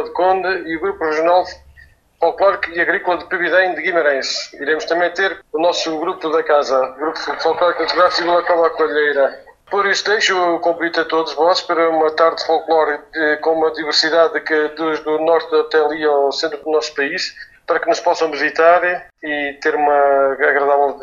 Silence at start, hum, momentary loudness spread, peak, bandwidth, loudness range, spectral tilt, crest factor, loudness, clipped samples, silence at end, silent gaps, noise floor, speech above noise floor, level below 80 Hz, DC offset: 0 s; none; 6 LU; 0 dBFS; 7.6 kHz; 2 LU; -2.5 dB/octave; 16 dB; -16 LUFS; under 0.1%; 0 s; none; -48 dBFS; 31 dB; -56 dBFS; under 0.1%